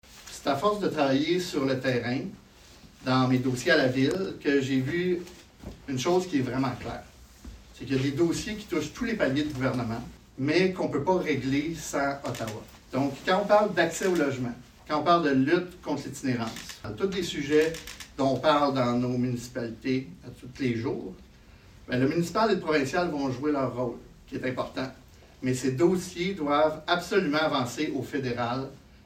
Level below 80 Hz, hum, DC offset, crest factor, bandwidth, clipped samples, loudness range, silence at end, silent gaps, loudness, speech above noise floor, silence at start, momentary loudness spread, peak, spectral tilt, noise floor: -54 dBFS; none; under 0.1%; 20 dB; 16 kHz; under 0.1%; 3 LU; 0.25 s; none; -27 LUFS; 25 dB; 0.1 s; 13 LU; -8 dBFS; -5.5 dB/octave; -52 dBFS